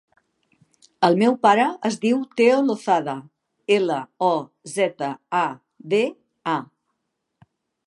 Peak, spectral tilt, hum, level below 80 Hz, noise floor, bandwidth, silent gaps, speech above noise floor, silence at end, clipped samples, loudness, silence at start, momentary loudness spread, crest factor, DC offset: -2 dBFS; -5 dB/octave; none; -76 dBFS; -77 dBFS; 11.5 kHz; none; 57 dB; 1.25 s; under 0.1%; -21 LUFS; 1 s; 13 LU; 20 dB; under 0.1%